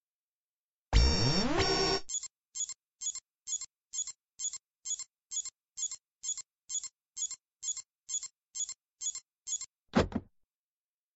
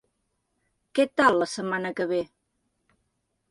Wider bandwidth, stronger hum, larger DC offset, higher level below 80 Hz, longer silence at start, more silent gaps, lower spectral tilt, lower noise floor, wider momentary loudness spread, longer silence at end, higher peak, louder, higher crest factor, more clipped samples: second, 8.2 kHz vs 11.5 kHz; neither; neither; first, -42 dBFS vs -68 dBFS; about the same, 0.9 s vs 0.95 s; first, 4.70-4.74 s, 6.11-6.15 s, 7.97-8.01 s, 8.91-8.96 s, 9.38-9.42 s vs none; second, -3 dB/octave vs -4.5 dB/octave; first, under -90 dBFS vs -76 dBFS; about the same, 12 LU vs 10 LU; second, 0.9 s vs 1.25 s; second, -14 dBFS vs -6 dBFS; second, -35 LUFS vs -25 LUFS; about the same, 22 dB vs 22 dB; neither